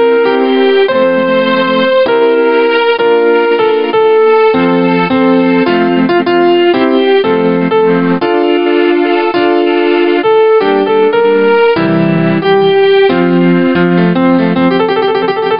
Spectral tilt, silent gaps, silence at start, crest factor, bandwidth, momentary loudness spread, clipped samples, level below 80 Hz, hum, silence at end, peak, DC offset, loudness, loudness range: -11.5 dB/octave; none; 0 s; 8 dB; 5.4 kHz; 2 LU; under 0.1%; -50 dBFS; none; 0 s; 0 dBFS; 0.8%; -9 LUFS; 1 LU